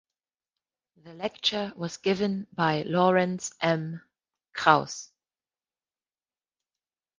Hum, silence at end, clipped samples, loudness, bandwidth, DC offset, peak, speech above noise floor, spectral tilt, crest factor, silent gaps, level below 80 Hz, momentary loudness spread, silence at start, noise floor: none; 2.15 s; under 0.1%; -26 LUFS; 9.8 kHz; under 0.1%; -4 dBFS; over 63 dB; -4.5 dB/octave; 26 dB; none; -68 dBFS; 16 LU; 1.05 s; under -90 dBFS